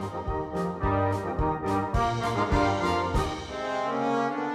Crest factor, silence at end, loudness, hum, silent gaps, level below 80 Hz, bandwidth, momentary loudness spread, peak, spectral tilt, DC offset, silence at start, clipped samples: 16 dB; 0 s; -28 LUFS; none; none; -38 dBFS; 14 kHz; 7 LU; -10 dBFS; -6.5 dB/octave; under 0.1%; 0 s; under 0.1%